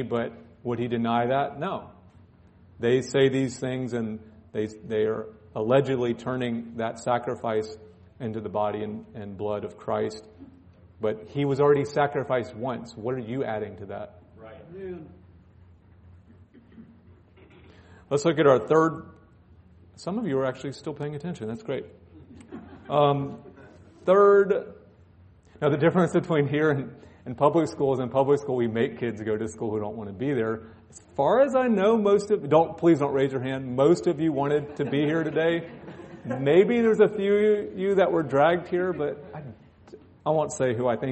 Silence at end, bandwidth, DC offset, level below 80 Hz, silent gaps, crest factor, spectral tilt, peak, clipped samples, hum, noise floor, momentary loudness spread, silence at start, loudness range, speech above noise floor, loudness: 0 s; 8.4 kHz; under 0.1%; -62 dBFS; none; 20 dB; -7 dB/octave; -6 dBFS; under 0.1%; none; -54 dBFS; 17 LU; 0 s; 10 LU; 30 dB; -25 LUFS